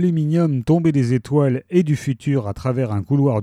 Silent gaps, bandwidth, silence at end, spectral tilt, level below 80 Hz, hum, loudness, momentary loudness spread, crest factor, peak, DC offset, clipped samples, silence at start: none; 11 kHz; 0 s; -8.5 dB/octave; -50 dBFS; none; -19 LUFS; 5 LU; 14 dB; -4 dBFS; under 0.1%; under 0.1%; 0 s